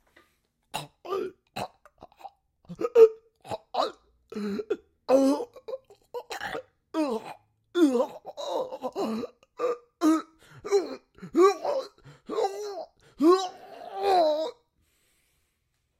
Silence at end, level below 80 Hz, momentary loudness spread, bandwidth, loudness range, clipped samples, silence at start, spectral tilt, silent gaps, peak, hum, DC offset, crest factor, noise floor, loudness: 1.5 s; -70 dBFS; 20 LU; 16 kHz; 4 LU; under 0.1%; 0.75 s; -5 dB/octave; none; -6 dBFS; none; under 0.1%; 22 dB; -76 dBFS; -27 LUFS